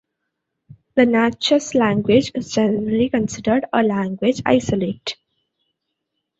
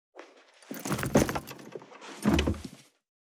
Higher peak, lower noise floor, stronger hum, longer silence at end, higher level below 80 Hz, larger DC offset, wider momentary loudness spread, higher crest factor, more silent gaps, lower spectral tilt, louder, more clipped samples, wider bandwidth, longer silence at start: first, -2 dBFS vs -10 dBFS; first, -77 dBFS vs -55 dBFS; neither; first, 1.25 s vs 0.5 s; second, -52 dBFS vs -44 dBFS; neither; second, 7 LU vs 20 LU; about the same, 18 dB vs 22 dB; neither; about the same, -5.5 dB/octave vs -5 dB/octave; first, -19 LUFS vs -30 LUFS; neither; second, 8 kHz vs over 20 kHz; first, 0.95 s vs 0.15 s